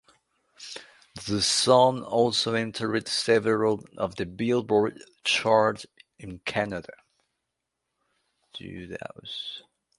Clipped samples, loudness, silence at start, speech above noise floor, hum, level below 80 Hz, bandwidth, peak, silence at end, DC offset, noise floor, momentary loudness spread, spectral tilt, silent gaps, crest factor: under 0.1%; -25 LUFS; 0.6 s; 57 dB; none; -60 dBFS; 11.5 kHz; -4 dBFS; 0.4 s; under 0.1%; -83 dBFS; 21 LU; -3.5 dB/octave; none; 22 dB